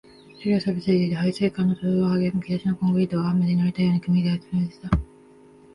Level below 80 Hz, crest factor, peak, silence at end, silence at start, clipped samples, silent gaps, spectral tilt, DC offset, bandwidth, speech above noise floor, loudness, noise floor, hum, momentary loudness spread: -42 dBFS; 16 dB; -6 dBFS; 0.7 s; 0.4 s; under 0.1%; none; -8.5 dB/octave; under 0.1%; 10.5 kHz; 28 dB; -23 LUFS; -50 dBFS; none; 5 LU